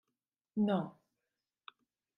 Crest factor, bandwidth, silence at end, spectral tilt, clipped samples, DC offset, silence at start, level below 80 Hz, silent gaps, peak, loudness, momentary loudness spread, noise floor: 20 dB; 4.1 kHz; 1.25 s; -9.5 dB/octave; under 0.1%; under 0.1%; 0.55 s; -86 dBFS; none; -20 dBFS; -36 LUFS; 24 LU; -90 dBFS